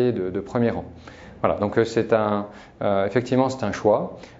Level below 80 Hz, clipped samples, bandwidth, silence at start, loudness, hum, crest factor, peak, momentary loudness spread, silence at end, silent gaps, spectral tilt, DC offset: -52 dBFS; under 0.1%; 7.8 kHz; 0 s; -23 LUFS; none; 20 dB; -2 dBFS; 13 LU; 0 s; none; -7 dB/octave; under 0.1%